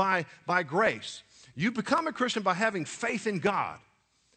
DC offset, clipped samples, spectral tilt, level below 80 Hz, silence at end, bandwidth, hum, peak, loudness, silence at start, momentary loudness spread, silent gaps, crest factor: under 0.1%; under 0.1%; -4.5 dB/octave; -70 dBFS; 0.6 s; 9.6 kHz; none; -10 dBFS; -29 LUFS; 0 s; 10 LU; none; 20 dB